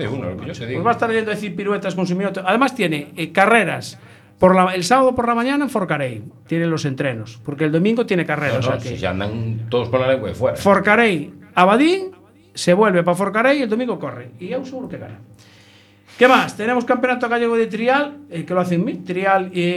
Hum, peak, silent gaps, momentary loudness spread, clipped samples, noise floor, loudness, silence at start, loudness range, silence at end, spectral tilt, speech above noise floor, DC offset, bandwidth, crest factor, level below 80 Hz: none; 0 dBFS; none; 14 LU; under 0.1%; -49 dBFS; -18 LUFS; 0 s; 4 LU; 0 s; -6 dB/octave; 31 dB; under 0.1%; 14.5 kHz; 18 dB; -56 dBFS